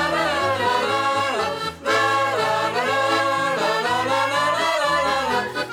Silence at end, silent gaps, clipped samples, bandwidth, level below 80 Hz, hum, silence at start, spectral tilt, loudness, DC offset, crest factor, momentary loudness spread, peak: 0 s; none; under 0.1%; 17.5 kHz; -56 dBFS; none; 0 s; -3 dB/octave; -20 LUFS; under 0.1%; 14 dB; 3 LU; -8 dBFS